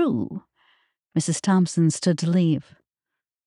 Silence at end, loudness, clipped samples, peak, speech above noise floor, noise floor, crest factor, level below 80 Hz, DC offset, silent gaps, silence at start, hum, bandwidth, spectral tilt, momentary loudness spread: 0.85 s; -23 LUFS; under 0.1%; -8 dBFS; 65 dB; -86 dBFS; 16 dB; -68 dBFS; under 0.1%; none; 0 s; none; 11 kHz; -6 dB/octave; 8 LU